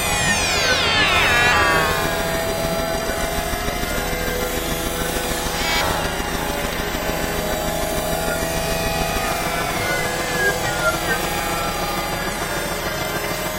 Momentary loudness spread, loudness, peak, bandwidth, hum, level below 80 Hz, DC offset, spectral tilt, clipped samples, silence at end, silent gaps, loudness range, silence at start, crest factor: 8 LU; -20 LUFS; 0 dBFS; 16 kHz; none; -32 dBFS; under 0.1%; -3 dB/octave; under 0.1%; 0 s; none; 5 LU; 0 s; 20 dB